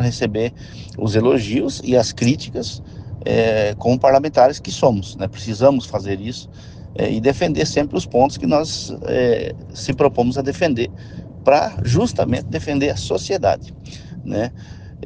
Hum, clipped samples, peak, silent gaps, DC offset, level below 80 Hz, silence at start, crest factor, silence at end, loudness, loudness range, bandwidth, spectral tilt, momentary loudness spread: none; under 0.1%; 0 dBFS; none; under 0.1%; -42 dBFS; 0 s; 18 dB; 0 s; -19 LUFS; 3 LU; 9.8 kHz; -6 dB/octave; 17 LU